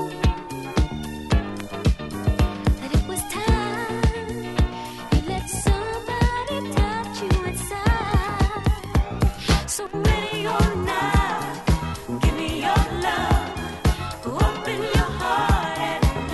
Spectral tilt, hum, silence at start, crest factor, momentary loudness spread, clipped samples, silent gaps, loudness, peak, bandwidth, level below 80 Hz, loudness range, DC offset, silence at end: -5.5 dB/octave; none; 0 s; 16 dB; 6 LU; under 0.1%; none; -24 LUFS; -6 dBFS; 12.5 kHz; -26 dBFS; 2 LU; under 0.1%; 0 s